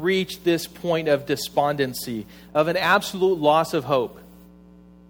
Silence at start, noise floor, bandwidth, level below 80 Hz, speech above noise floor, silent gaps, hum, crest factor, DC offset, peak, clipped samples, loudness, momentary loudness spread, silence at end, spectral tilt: 0 s; -48 dBFS; over 20 kHz; -56 dBFS; 26 dB; none; none; 18 dB; under 0.1%; -4 dBFS; under 0.1%; -22 LUFS; 8 LU; 0.85 s; -4.5 dB/octave